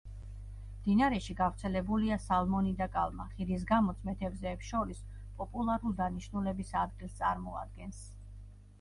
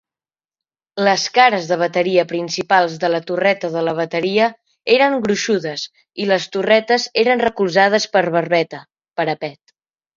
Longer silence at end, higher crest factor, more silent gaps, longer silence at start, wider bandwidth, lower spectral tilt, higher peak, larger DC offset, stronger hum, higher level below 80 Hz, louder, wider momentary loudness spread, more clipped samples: second, 0 s vs 0.65 s; about the same, 18 dB vs 18 dB; neither; second, 0.05 s vs 0.95 s; first, 11.5 kHz vs 7.6 kHz; first, -7 dB/octave vs -4 dB/octave; second, -16 dBFS vs 0 dBFS; neither; first, 50 Hz at -45 dBFS vs none; first, -46 dBFS vs -62 dBFS; second, -34 LUFS vs -17 LUFS; first, 18 LU vs 12 LU; neither